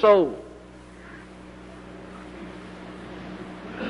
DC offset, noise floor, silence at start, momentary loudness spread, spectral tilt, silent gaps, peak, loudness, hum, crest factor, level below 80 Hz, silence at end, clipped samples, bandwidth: under 0.1%; -45 dBFS; 0 s; 18 LU; -6.5 dB/octave; none; -6 dBFS; -28 LUFS; none; 20 dB; -52 dBFS; 0 s; under 0.1%; 10.5 kHz